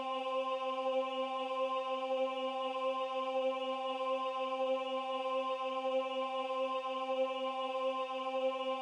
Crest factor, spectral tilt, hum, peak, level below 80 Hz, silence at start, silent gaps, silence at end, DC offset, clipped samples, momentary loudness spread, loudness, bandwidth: 12 dB; -2 dB/octave; none; -24 dBFS; under -90 dBFS; 0 s; none; 0 s; under 0.1%; under 0.1%; 2 LU; -36 LUFS; 9.8 kHz